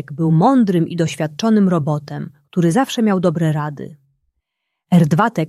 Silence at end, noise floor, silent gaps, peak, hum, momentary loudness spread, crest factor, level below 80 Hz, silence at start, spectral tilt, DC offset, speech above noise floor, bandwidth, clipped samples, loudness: 0 s; -77 dBFS; none; -2 dBFS; none; 13 LU; 16 dB; -58 dBFS; 0.1 s; -7 dB/octave; under 0.1%; 61 dB; 13 kHz; under 0.1%; -16 LUFS